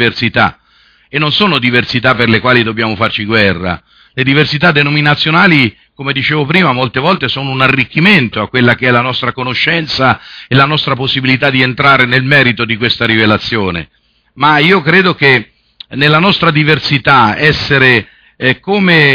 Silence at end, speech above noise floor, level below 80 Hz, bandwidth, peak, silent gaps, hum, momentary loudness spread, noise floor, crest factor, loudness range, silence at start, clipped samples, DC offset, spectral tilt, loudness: 0 s; 38 dB; -42 dBFS; 5.4 kHz; 0 dBFS; none; none; 7 LU; -48 dBFS; 10 dB; 2 LU; 0 s; 0.2%; under 0.1%; -6.5 dB/octave; -9 LUFS